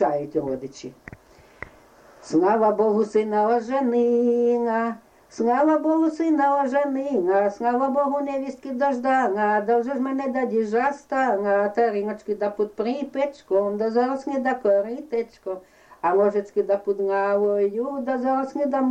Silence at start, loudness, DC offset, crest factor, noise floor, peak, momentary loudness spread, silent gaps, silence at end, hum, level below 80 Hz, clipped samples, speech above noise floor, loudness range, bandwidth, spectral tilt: 0 s; -23 LUFS; under 0.1%; 14 dB; -51 dBFS; -10 dBFS; 9 LU; none; 0 s; none; -64 dBFS; under 0.1%; 29 dB; 3 LU; 9 kHz; -6.5 dB/octave